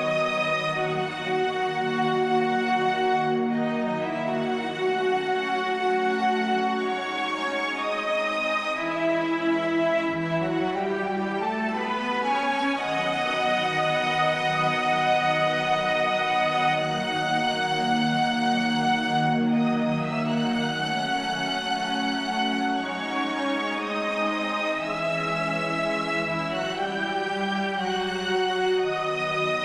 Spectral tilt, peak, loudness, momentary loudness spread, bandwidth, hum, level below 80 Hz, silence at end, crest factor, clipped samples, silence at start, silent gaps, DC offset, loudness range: -5 dB/octave; -12 dBFS; -25 LUFS; 4 LU; 12 kHz; none; -60 dBFS; 0 s; 14 dB; under 0.1%; 0 s; none; under 0.1%; 3 LU